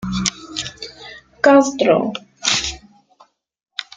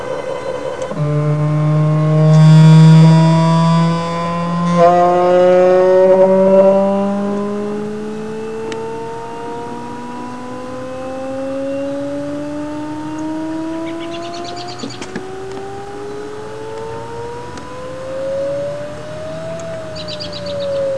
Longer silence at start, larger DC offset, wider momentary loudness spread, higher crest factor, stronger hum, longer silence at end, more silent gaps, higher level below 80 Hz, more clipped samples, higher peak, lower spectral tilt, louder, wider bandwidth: about the same, 0 s vs 0 s; second, under 0.1% vs 2%; first, 21 LU vs 18 LU; first, 20 dB vs 14 dB; neither; first, 0.15 s vs 0 s; neither; about the same, -46 dBFS vs -50 dBFS; neither; about the same, 0 dBFS vs 0 dBFS; second, -3.5 dB/octave vs -8 dB/octave; second, -17 LUFS vs -14 LUFS; about the same, 9.6 kHz vs 9.8 kHz